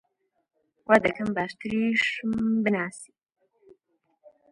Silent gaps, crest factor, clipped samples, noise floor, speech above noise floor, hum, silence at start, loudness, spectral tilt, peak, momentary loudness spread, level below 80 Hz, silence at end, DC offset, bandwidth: none; 24 dB; under 0.1%; -72 dBFS; 47 dB; none; 0.9 s; -25 LUFS; -5.5 dB/octave; -4 dBFS; 12 LU; -62 dBFS; 1.45 s; under 0.1%; 11 kHz